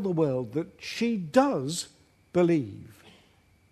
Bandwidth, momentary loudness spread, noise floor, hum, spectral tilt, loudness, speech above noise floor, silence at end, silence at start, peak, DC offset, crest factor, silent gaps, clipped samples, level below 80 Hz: 13.5 kHz; 13 LU; -62 dBFS; none; -6 dB/octave; -27 LUFS; 35 dB; 0.8 s; 0 s; -8 dBFS; under 0.1%; 20 dB; none; under 0.1%; -66 dBFS